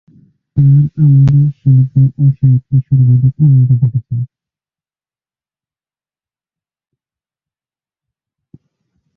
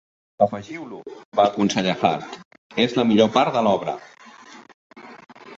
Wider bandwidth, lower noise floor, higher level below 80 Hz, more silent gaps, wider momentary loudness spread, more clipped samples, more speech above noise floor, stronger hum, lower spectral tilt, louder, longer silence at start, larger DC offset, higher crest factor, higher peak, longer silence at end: second, 1.4 kHz vs 7.8 kHz; first, under -90 dBFS vs -45 dBFS; first, -42 dBFS vs -62 dBFS; second, none vs 1.25-1.32 s, 2.45-2.51 s, 2.58-2.70 s, 4.74-4.90 s; second, 10 LU vs 18 LU; neither; first, over 81 dB vs 25 dB; neither; first, -12.5 dB/octave vs -5.5 dB/octave; first, -11 LUFS vs -20 LUFS; first, 0.55 s vs 0.4 s; neither; second, 12 dB vs 20 dB; about the same, -2 dBFS vs -2 dBFS; first, 4.9 s vs 0.05 s